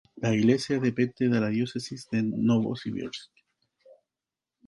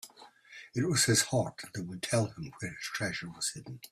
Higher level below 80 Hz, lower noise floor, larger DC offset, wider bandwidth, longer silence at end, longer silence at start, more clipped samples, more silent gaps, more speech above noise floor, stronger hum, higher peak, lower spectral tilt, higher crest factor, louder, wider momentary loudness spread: about the same, -64 dBFS vs -66 dBFS; first, -90 dBFS vs -56 dBFS; neither; second, 11.5 kHz vs 15.5 kHz; first, 1.45 s vs 0.05 s; about the same, 0.15 s vs 0.05 s; neither; neither; first, 64 dB vs 23 dB; neither; about the same, -10 dBFS vs -12 dBFS; first, -6.5 dB/octave vs -3.5 dB/octave; about the same, 18 dB vs 22 dB; first, -27 LUFS vs -32 LUFS; second, 12 LU vs 18 LU